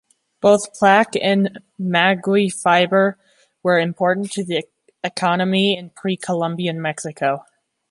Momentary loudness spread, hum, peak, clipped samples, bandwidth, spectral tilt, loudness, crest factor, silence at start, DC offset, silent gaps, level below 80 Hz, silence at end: 10 LU; none; -2 dBFS; under 0.1%; 11.5 kHz; -5 dB/octave; -19 LUFS; 18 dB; 0.45 s; under 0.1%; none; -66 dBFS; 0.5 s